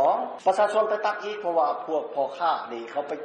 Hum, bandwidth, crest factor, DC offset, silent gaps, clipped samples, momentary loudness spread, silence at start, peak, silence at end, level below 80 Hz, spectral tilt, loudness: none; 9.4 kHz; 14 dB; under 0.1%; none; under 0.1%; 8 LU; 0 s; -12 dBFS; 0 s; -76 dBFS; -4 dB/octave; -26 LUFS